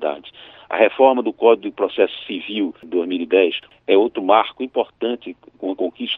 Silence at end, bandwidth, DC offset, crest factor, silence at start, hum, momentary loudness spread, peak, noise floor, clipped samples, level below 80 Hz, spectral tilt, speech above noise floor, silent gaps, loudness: 0 s; 4.1 kHz; under 0.1%; 18 dB; 0 s; none; 13 LU; -2 dBFS; -42 dBFS; under 0.1%; -68 dBFS; -7.5 dB/octave; 24 dB; none; -19 LUFS